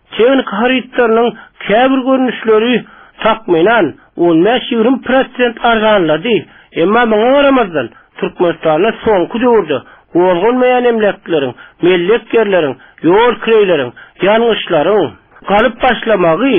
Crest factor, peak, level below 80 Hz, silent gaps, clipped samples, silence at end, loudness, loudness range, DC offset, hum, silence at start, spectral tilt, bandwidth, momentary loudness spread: 10 dB; 0 dBFS; -44 dBFS; none; under 0.1%; 0 s; -12 LUFS; 1 LU; under 0.1%; none; 0.1 s; -3 dB/octave; 3.8 kHz; 7 LU